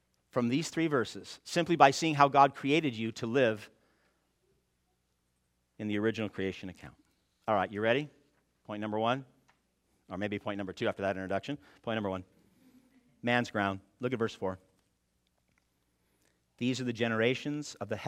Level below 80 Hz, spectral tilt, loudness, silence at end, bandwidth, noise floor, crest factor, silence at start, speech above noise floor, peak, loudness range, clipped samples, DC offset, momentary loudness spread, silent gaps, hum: -74 dBFS; -5.5 dB/octave; -31 LUFS; 0 s; 16 kHz; -77 dBFS; 26 dB; 0.35 s; 46 dB; -6 dBFS; 11 LU; under 0.1%; under 0.1%; 15 LU; none; none